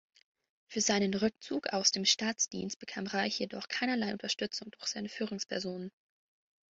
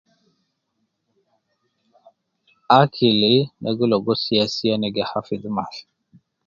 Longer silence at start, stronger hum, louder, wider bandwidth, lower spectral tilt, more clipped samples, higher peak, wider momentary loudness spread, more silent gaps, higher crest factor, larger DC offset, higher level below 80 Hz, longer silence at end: second, 0.7 s vs 2.7 s; neither; second, -33 LUFS vs -19 LUFS; about the same, 8 kHz vs 7.4 kHz; second, -2.5 dB/octave vs -6.5 dB/octave; neither; second, -12 dBFS vs 0 dBFS; about the same, 11 LU vs 12 LU; first, 2.76-2.80 s vs none; about the same, 24 dB vs 22 dB; neither; second, -74 dBFS vs -60 dBFS; first, 0.85 s vs 0.65 s